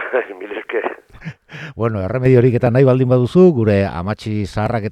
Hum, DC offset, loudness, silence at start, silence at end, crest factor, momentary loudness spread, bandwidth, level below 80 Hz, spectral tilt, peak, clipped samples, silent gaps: none; under 0.1%; -16 LUFS; 0 s; 0 s; 16 dB; 21 LU; 9.4 kHz; -44 dBFS; -9 dB/octave; 0 dBFS; under 0.1%; none